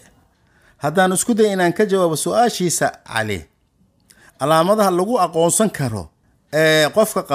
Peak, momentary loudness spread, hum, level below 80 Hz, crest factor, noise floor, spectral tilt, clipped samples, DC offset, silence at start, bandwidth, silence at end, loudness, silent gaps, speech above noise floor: -2 dBFS; 10 LU; none; -54 dBFS; 16 dB; -60 dBFS; -4 dB/octave; under 0.1%; under 0.1%; 0.85 s; 16 kHz; 0 s; -17 LUFS; none; 43 dB